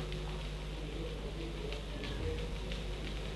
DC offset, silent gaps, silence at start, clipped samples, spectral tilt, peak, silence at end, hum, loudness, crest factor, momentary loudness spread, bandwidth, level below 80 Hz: under 0.1%; none; 0 s; under 0.1%; -5.5 dB/octave; -24 dBFS; 0 s; 50 Hz at -40 dBFS; -41 LUFS; 16 dB; 3 LU; 12 kHz; -42 dBFS